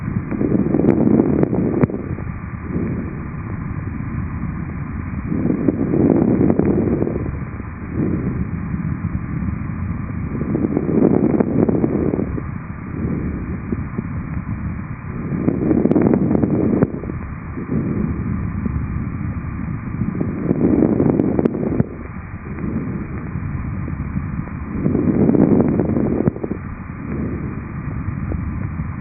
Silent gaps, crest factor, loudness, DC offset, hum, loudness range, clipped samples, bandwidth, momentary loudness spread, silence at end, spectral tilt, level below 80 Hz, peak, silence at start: none; 20 dB; -20 LUFS; under 0.1%; none; 5 LU; under 0.1%; 2.7 kHz; 12 LU; 0 s; -12.5 dB/octave; -34 dBFS; 0 dBFS; 0 s